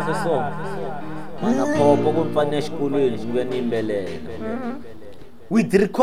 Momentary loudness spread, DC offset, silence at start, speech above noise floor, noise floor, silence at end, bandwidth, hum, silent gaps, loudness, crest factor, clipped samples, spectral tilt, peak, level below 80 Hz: 14 LU; 3%; 0 s; 21 dB; -42 dBFS; 0 s; 15 kHz; none; none; -22 LUFS; 20 dB; under 0.1%; -6.5 dB/octave; -2 dBFS; -52 dBFS